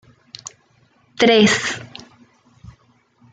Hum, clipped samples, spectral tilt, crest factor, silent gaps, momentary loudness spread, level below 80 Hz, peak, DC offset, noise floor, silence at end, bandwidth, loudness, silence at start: none; under 0.1%; -3.5 dB/octave; 20 dB; none; 26 LU; -58 dBFS; -2 dBFS; under 0.1%; -58 dBFS; 0.65 s; 9.4 kHz; -15 LUFS; 0.45 s